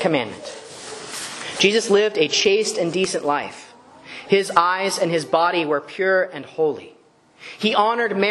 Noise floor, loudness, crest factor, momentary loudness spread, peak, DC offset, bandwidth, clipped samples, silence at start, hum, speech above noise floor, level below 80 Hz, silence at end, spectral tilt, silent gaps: -42 dBFS; -20 LUFS; 20 dB; 17 LU; 0 dBFS; under 0.1%; 12.5 kHz; under 0.1%; 0 s; none; 23 dB; -68 dBFS; 0 s; -3 dB/octave; none